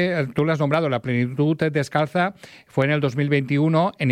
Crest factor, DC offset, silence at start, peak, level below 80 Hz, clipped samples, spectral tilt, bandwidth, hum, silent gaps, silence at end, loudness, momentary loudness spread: 16 dB; under 0.1%; 0 s; -6 dBFS; -60 dBFS; under 0.1%; -7.5 dB/octave; 11 kHz; none; none; 0 s; -21 LUFS; 4 LU